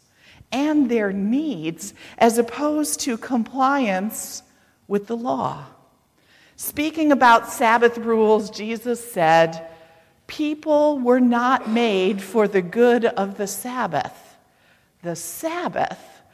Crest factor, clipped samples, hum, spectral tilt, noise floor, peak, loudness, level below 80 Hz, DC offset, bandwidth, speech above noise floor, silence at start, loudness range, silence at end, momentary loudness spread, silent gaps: 18 dB; under 0.1%; none; -4.5 dB/octave; -59 dBFS; -4 dBFS; -20 LUFS; -62 dBFS; under 0.1%; 16 kHz; 39 dB; 0.5 s; 7 LU; 0.25 s; 13 LU; none